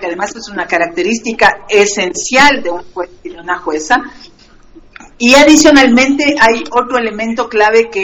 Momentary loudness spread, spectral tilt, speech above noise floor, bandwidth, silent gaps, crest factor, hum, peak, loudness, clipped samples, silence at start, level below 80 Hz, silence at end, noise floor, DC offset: 16 LU; -2.5 dB/octave; 30 dB; over 20 kHz; none; 12 dB; none; 0 dBFS; -10 LUFS; 0.8%; 0 s; -40 dBFS; 0 s; -40 dBFS; under 0.1%